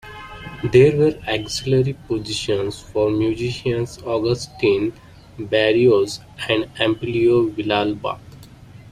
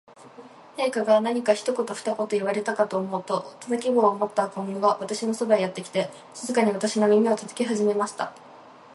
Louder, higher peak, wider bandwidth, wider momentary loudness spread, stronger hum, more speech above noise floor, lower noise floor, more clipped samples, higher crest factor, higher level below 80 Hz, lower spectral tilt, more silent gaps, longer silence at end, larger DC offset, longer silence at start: first, -20 LUFS vs -25 LUFS; first, -2 dBFS vs -6 dBFS; first, 13 kHz vs 11.5 kHz; first, 12 LU vs 8 LU; neither; about the same, 23 dB vs 23 dB; second, -42 dBFS vs -47 dBFS; neither; about the same, 18 dB vs 18 dB; first, -46 dBFS vs -78 dBFS; about the same, -6 dB/octave vs -5 dB/octave; neither; about the same, 0.05 s vs 0 s; neither; second, 0.05 s vs 0.2 s